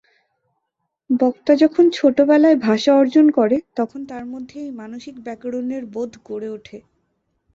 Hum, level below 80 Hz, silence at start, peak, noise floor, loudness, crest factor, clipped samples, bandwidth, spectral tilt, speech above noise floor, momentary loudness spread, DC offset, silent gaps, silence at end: none; -64 dBFS; 1.1 s; -2 dBFS; -77 dBFS; -17 LUFS; 16 dB; under 0.1%; 7.6 kHz; -6 dB/octave; 59 dB; 18 LU; under 0.1%; none; 0.75 s